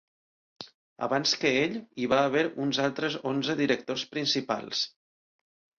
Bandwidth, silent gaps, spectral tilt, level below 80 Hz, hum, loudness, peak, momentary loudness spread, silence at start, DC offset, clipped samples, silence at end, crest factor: 7.2 kHz; 0.74-0.96 s; -4 dB/octave; -70 dBFS; none; -28 LUFS; -10 dBFS; 11 LU; 0.6 s; under 0.1%; under 0.1%; 0.9 s; 18 dB